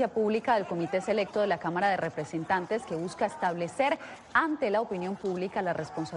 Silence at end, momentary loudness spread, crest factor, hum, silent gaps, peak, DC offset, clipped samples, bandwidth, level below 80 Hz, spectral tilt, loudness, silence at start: 0 s; 6 LU; 18 dB; none; none; -10 dBFS; under 0.1%; under 0.1%; 11 kHz; -66 dBFS; -5.5 dB/octave; -30 LUFS; 0 s